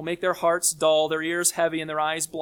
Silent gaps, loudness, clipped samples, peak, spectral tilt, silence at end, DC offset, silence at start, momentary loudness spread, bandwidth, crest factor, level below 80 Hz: none; -23 LUFS; under 0.1%; -8 dBFS; -2 dB/octave; 0 s; under 0.1%; 0 s; 5 LU; 18.5 kHz; 16 dB; -66 dBFS